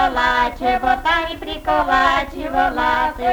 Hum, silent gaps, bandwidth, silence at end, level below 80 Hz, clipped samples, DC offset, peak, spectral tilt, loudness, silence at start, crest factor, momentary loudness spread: none; none; over 20 kHz; 0 s; -34 dBFS; under 0.1%; under 0.1%; -2 dBFS; -4 dB/octave; -18 LUFS; 0 s; 14 dB; 6 LU